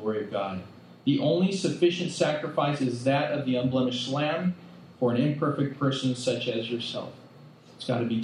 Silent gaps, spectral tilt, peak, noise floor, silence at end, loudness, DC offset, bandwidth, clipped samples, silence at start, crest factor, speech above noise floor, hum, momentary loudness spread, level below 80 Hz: none; -6 dB/octave; -8 dBFS; -51 dBFS; 0 s; -27 LUFS; under 0.1%; 11 kHz; under 0.1%; 0 s; 18 dB; 24 dB; none; 8 LU; -74 dBFS